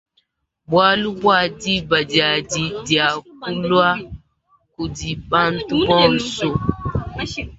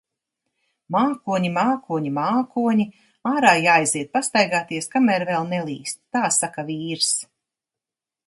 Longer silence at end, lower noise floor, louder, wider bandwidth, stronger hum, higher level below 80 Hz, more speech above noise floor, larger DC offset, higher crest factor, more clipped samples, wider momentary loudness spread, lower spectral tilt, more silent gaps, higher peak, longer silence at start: second, 0.05 s vs 1.05 s; second, -66 dBFS vs -89 dBFS; first, -18 LUFS vs -21 LUFS; second, 8 kHz vs 11.5 kHz; neither; first, -40 dBFS vs -70 dBFS; second, 48 dB vs 68 dB; neither; about the same, 18 dB vs 22 dB; neither; about the same, 12 LU vs 10 LU; about the same, -4.5 dB/octave vs -3.5 dB/octave; neither; about the same, -2 dBFS vs 0 dBFS; second, 0.7 s vs 0.9 s